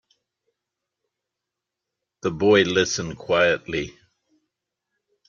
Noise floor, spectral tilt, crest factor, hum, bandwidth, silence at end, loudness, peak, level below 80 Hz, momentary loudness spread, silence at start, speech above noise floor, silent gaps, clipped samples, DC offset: -85 dBFS; -4 dB/octave; 22 dB; none; 7.4 kHz; 1.4 s; -21 LUFS; -4 dBFS; -56 dBFS; 12 LU; 2.25 s; 64 dB; none; under 0.1%; under 0.1%